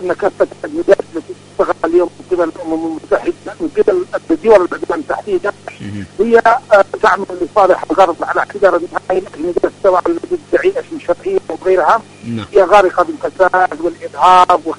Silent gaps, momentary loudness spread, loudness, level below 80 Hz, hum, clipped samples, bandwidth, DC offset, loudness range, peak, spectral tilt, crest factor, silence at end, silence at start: none; 11 LU; -13 LUFS; -46 dBFS; 50 Hz at -45 dBFS; 0.2%; 11 kHz; under 0.1%; 4 LU; 0 dBFS; -5.5 dB/octave; 14 dB; 0.05 s; 0 s